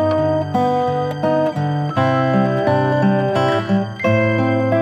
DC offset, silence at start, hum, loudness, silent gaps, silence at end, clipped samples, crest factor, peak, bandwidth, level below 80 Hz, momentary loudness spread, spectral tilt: under 0.1%; 0 s; none; -17 LUFS; none; 0 s; under 0.1%; 14 dB; -2 dBFS; 9.8 kHz; -56 dBFS; 4 LU; -8 dB/octave